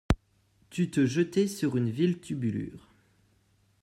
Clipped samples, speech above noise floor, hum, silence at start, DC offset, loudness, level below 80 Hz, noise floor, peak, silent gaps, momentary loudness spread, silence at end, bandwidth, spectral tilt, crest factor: under 0.1%; 39 dB; none; 0.1 s; under 0.1%; -29 LUFS; -44 dBFS; -67 dBFS; -10 dBFS; none; 9 LU; 1.05 s; 14 kHz; -6.5 dB/octave; 20 dB